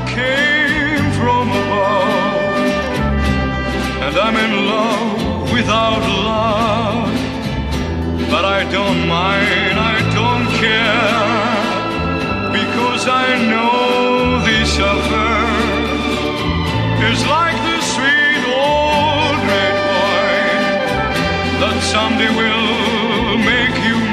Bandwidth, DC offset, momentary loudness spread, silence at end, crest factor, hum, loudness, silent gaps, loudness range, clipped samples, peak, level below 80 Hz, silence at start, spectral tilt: 14 kHz; under 0.1%; 5 LU; 0 s; 12 dB; none; -15 LUFS; none; 2 LU; under 0.1%; -2 dBFS; -30 dBFS; 0 s; -5 dB/octave